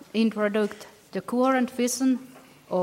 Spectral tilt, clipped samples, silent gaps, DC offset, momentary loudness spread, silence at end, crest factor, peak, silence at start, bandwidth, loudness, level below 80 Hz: -4.5 dB/octave; under 0.1%; none; under 0.1%; 11 LU; 0 s; 16 dB; -10 dBFS; 0.15 s; 16.5 kHz; -26 LUFS; -74 dBFS